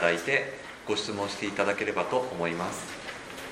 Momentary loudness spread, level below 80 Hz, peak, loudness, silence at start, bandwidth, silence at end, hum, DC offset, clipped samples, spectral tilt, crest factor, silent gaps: 11 LU; -64 dBFS; -6 dBFS; -30 LUFS; 0 s; 16 kHz; 0 s; none; under 0.1%; under 0.1%; -3.5 dB/octave; 24 dB; none